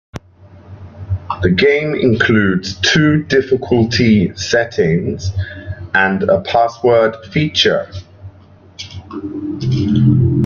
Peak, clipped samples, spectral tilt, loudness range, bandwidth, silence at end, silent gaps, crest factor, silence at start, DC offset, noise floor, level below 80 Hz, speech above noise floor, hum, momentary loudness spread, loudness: 0 dBFS; under 0.1%; -6 dB/octave; 4 LU; 7.4 kHz; 0 s; none; 14 dB; 0.15 s; under 0.1%; -43 dBFS; -42 dBFS; 29 dB; none; 16 LU; -14 LUFS